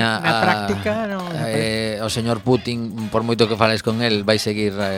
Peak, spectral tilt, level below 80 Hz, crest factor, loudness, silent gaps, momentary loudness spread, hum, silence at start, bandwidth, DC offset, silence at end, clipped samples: 0 dBFS; -5 dB/octave; -50 dBFS; 20 dB; -20 LUFS; none; 6 LU; none; 0 s; 16.5 kHz; under 0.1%; 0 s; under 0.1%